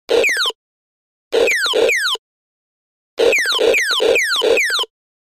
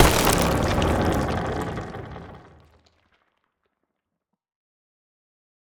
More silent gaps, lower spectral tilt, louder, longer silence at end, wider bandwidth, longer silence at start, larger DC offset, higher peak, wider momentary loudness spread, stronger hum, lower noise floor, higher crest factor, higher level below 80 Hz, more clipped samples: first, 0.55-1.31 s, 2.19-3.17 s vs none; second, 0 dB/octave vs -4.5 dB/octave; first, -15 LUFS vs -23 LUFS; second, 0.55 s vs 3.25 s; second, 16 kHz vs over 20 kHz; about the same, 0.1 s vs 0 s; first, 0.1% vs under 0.1%; about the same, -2 dBFS vs 0 dBFS; second, 7 LU vs 20 LU; neither; first, under -90 dBFS vs -81 dBFS; second, 16 dB vs 26 dB; second, -56 dBFS vs -36 dBFS; neither